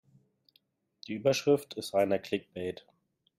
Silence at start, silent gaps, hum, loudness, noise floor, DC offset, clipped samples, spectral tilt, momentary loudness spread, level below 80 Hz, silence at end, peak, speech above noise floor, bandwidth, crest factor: 1.1 s; none; none; -31 LUFS; -72 dBFS; under 0.1%; under 0.1%; -5 dB/octave; 14 LU; -72 dBFS; 0.65 s; -14 dBFS; 42 dB; 16 kHz; 20 dB